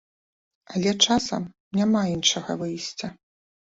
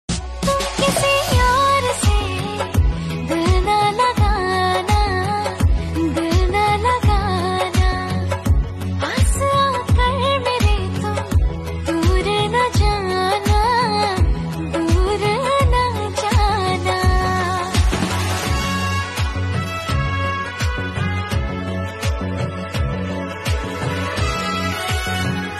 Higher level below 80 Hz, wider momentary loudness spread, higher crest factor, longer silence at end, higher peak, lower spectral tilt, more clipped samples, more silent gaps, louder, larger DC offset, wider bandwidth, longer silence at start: second, -58 dBFS vs -24 dBFS; first, 12 LU vs 7 LU; first, 22 dB vs 14 dB; first, 0.55 s vs 0 s; about the same, -4 dBFS vs -4 dBFS; second, -3.5 dB/octave vs -5 dB/octave; neither; first, 1.60-1.71 s vs none; second, -24 LUFS vs -19 LUFS; neither; second, 8 kHz vs 13.5 kHz; first, 0.7 s vs 0.1 s